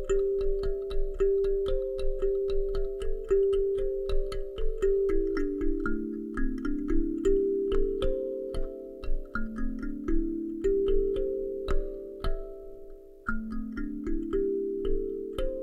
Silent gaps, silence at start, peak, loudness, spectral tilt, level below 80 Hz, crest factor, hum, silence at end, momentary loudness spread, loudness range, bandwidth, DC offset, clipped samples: none; 0 s; -14 dBFS; -31 LUFS; -7.5 dB/octave; -32 dBFS; 14 dB; none; 0 s; 10 LU; 5 LU; 7.6 kHz; under 0.1%; under 0.1%